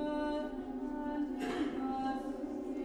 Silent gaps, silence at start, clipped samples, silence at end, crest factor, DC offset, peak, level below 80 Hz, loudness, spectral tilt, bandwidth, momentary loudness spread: none; 0 s; under 0.1%; 0 s; 12 dB; under 0.1%; -24 dBFS; -58 dBFS; -38 LUFS; -5.5 dB/octave; 12.5 kHz; 4 LU